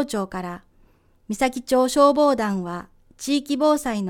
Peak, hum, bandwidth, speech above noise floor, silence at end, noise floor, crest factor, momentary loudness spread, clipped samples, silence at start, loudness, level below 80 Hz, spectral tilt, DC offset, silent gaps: -6 dBFS; none; 18 kHz; 36 dB; 0 s; -57 dBFS; 18 dB; 17 LU; under 0.1%; 0 s; -21 LUFS; -52 dBFS; -4.5 dB/octave; under 0.1%; none